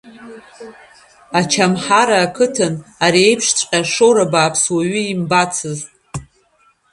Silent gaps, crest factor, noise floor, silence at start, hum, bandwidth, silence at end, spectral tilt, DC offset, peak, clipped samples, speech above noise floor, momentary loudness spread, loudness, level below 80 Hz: none; 16 dB; -56 dBFS; 0.05 s; none; 11.5 kHz; 0.7 s; -3.5 dB/octave; under 0.1%; 0 dBFS; under 0.1%; 41 dB; 16 LU; -14 LUFS; -54 dBFS